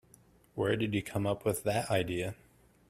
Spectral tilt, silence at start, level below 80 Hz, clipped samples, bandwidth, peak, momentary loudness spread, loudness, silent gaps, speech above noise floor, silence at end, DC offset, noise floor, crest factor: -5.5 dB/octave; 0.55 s; -62 dBFS; under 0.1%; 15.5 kHz; -14 dBFS; 10 LU; -33 LUFS; none; 30 dB; 0.55 s; under 0.1%; -63 dBFS; 20 dB